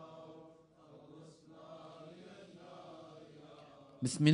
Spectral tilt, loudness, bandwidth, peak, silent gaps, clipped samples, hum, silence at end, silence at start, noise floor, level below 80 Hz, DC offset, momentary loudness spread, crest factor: -5.5 dB/octave; -44 LUFS; 10 kHz; -14 dBFS; none; under 0.1%; none; 0 s; 0 s; -61 dBFS; -78 dBFS; under 0.1%; 17 LU; 26 dB